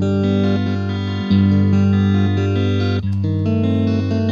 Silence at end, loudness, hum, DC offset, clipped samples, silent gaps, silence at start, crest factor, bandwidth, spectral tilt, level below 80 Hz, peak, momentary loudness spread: 0 s; -17 LUFS; none; under 0.1%; under 0.1%; none; 0 s; 12 dB; 7 kHz; -8.5 dB/octave; -50 dBFS; -4 dBFS; 5 LU